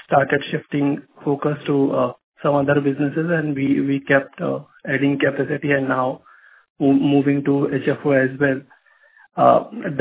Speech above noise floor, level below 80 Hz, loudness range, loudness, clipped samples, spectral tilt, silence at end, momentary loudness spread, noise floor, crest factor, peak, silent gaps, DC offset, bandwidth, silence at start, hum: 35 dB; -60 dBFS; 2 LU; -20 LUFS; under 0.1%; -11 dB/octave; 0 s; 9 LU; -53 dBFS; 18 dB; 0 dBFS; 2.24-2.32 s, 6.70-6.76 s; under 0.1%; 4 kHz; 0.1 s; none